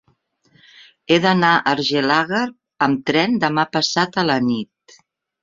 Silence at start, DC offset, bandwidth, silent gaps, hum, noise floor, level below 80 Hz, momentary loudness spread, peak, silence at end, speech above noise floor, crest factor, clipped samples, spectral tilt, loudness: 1.1 s; under 0.1%; 7.6 kHz; none; none; -62 dBFS; -60 dBFS; 8 LU; -2 dBFS; 0.8 s; 45 dB; 18 dB; under 0.1%; -4.5 dB/octave; -18 LUFS